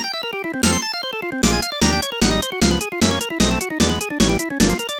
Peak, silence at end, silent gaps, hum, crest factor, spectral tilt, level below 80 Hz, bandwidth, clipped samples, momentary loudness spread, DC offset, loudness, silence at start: -2 dBFS; 0 s; none; none; 18 dB; -3.5 dB/octave; -32 dBFS; 18.5 kHz; under 0.1%; 5 LU; under 0.1%; -19 LUFS; 0 s